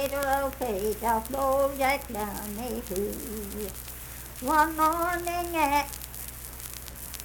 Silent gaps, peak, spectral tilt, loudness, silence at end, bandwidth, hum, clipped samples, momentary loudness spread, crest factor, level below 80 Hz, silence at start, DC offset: none; -8 dBFS; -3.5 dB/octave; -29 LUFS; 0 s; 19 kHz; none; under 0.1%; 14 LU; 20 dB; -44 dBFS; 0 s; under 0.1%